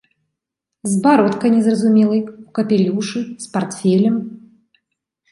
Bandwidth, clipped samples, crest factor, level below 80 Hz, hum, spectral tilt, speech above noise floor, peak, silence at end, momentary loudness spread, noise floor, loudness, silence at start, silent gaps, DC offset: 11.5 kHz; under 0.1%; 16 dB; -64 dBFS; none; -6.5 dB/octave; 66 dB; -2 dBFS; 0.95 s; 11 LU; -81 dBFS; -17 LUFS; 0.85 s; none; under 0.1%